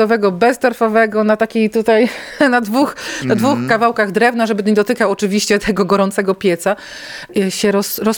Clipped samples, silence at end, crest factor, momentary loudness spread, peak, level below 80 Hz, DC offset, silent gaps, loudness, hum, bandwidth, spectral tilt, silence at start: under 0.1%; 0 s; 14 dB; 5 LU; -2 dBFS; -50 dBFS; under 0.1%; none; -15 LUFS; none; 19.5 kHz; -5 dB/octave; 0 s